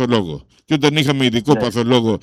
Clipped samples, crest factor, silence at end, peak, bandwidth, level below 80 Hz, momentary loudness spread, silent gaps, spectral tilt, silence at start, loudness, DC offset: under 0.1%; 16 dB; 0.05 s; 0 dBFS; 15 kHz; -48 dBFS; 8 LU; none; -5.5 dB/octave; 0 s; -16 LUFS; under 0.1%